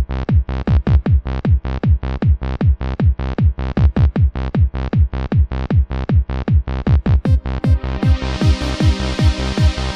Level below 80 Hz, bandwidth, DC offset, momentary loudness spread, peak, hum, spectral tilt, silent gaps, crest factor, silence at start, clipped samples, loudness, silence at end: -18 dBFS; 8.8 kHz; under 0.1%; 3 LU; -2 dBFS; none; -7.5 dB/octave; none; 12 dB; 0 s; under 0.1%; -17 LUFS; 0 s